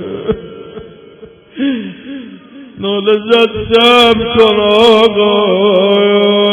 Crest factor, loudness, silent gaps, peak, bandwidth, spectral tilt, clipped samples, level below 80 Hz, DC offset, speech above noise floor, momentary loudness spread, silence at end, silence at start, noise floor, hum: 10 dB; -9 LUFS; none; 0 dBFS; 11.5 kHz; -5.5 dB/octave; under 0.1%; -40 dBFS; under 0.1%; 28 dB; 20 LU; 0 s; 0 s; -37 dBFS; none